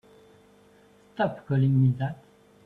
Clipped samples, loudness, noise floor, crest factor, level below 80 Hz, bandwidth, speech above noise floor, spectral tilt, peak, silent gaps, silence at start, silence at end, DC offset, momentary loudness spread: under 0.1%; -26 LUFS; -57 dBFS; 16 dB; -64 dBFS; 4.4 kHz; 33 dB; -10 dB/octave; -12 dBFS; none; 1.2 s; 0.5 s; under 0.1%; 19 LU